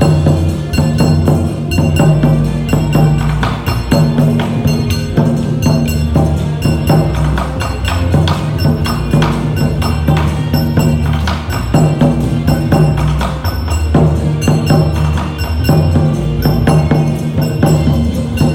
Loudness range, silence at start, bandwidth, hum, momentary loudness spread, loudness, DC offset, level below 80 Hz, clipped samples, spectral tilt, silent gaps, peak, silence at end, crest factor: 1 LU; 0 s; 16 kHz; none; 5 LU; -13 LUFS; under 0.1%; -22 dBFS; under 0.1%; -7 dB/octave; none; 0 dBFS; 0 s; 12 dB